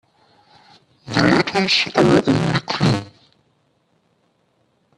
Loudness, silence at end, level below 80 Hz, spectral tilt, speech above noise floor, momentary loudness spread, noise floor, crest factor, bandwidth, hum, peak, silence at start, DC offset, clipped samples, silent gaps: -17 LUFS; 1.9 s; -50 dBFS; -5.5 dB/octave; 47 dB; 6 LU; -64 dBFS; 20 dB; 11.5 kHz; none; 0 dBFS; 1.05 s; under 0.1%; under 0.1%; none